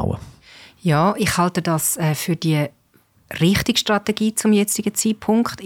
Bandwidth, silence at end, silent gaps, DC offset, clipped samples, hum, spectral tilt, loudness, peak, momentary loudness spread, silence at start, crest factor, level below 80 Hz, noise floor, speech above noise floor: 17.5 kHz; 0 s; none; under 0.1%; under 0.1%; none; -4.5 dB/octave; -19 LUFS; -6 dBFS; 7 LU; 0 s; 14 dB; -46 dBFS; -58 dBFS; 39 dB